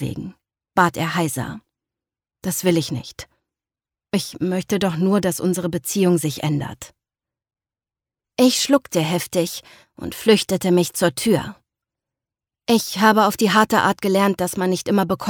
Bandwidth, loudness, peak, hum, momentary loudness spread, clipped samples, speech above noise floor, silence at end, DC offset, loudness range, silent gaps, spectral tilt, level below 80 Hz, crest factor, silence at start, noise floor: 19.5 kHz; -19 LUFS; -2 dBFS; none; 16 LU; under 0.1%; over 71 dB; 0 s; under 0.1%; 5 LU; none; -4.5 dB/octave; -54 dBFS; 20 dB; 0 s; under -90 dBFS